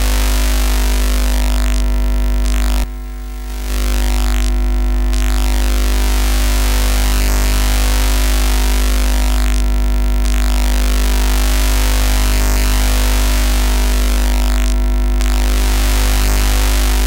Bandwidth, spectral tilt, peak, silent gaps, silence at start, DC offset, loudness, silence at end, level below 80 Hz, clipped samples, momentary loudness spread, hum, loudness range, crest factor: 17 kHz; -4 dB/octave; 0 dBFS; none; 0 s; under 0.1%; -16 LUFS; 0 s; -14 dBFS; under 0.1%; 2 LU; 50 Hz at -15 dBFS; 3 LU; 12 dB